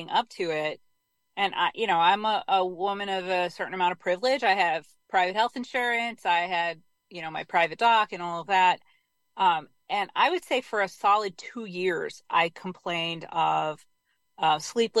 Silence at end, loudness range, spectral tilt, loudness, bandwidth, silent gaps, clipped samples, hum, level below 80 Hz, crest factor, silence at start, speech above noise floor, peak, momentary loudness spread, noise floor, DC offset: 0 s; 2 LU; -3.5 dB/octave; -26 LUFS; 12.5 kHz; none; under 0.1%; none; -74 dBFS; 18 dB; 0 s; 46 dB; -8 dBFS; 11 LU; -72 dBFS; under 0.1%